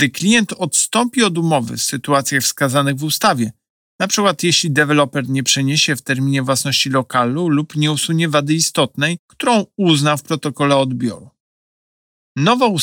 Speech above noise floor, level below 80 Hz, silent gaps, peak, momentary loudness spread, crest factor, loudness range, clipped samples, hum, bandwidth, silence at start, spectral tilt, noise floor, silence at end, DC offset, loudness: over 74 dB; -62 dBFS; 3.70-3.99 s, 9.19-9.29 s, 11.40-12.35 s; -2 dBFS; 6 LU; 14 dB; 2 LU; under 0.1%; none; 20 kHz; 0 s; -4 dB/octave; under -90 dBFS; 0 s; under 0.1%; -16 LUFS